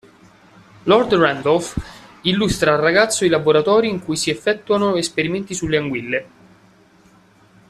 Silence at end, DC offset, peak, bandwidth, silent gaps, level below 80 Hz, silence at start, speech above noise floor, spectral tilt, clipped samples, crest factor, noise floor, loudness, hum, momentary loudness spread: 1.45 s; under 0.1%; -2 dBFS; 14 kHz; none; -44 dBFS; 0.85 s; 34 dB; -4 dB/octave; under 0.1%; 18 dB; -51 dBFS; -18 LUFS; none; 9 LU